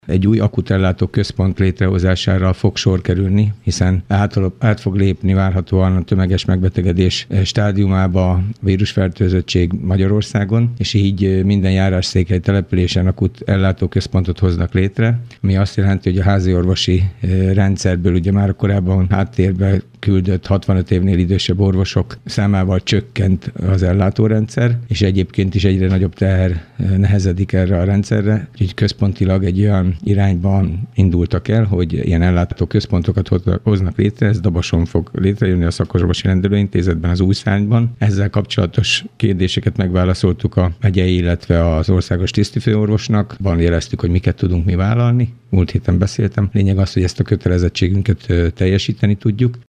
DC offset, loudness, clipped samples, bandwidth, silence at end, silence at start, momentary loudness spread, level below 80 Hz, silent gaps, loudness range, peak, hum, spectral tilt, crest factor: under 0.1%; -16 LUFS; under 0.1%; 9 kHz; 0.05 s; 0.05 s; 3 LU; -32 dBFS; none; 1 LU; -2 dBFS; none; -7 dB/octave; 12 dB